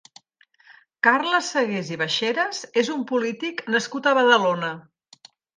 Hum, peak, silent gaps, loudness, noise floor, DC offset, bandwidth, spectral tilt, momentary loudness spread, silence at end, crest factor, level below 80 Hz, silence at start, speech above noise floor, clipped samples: none; -4 dBFS; none; -22 LUFS; -59 dBFS; under 0.1%; 9.8 kHz; -3.5 dB/octave; 10 LU; 0.75 s; 20 dB; -76 dBFS; 0.7 s; 37 dB; under 0.1%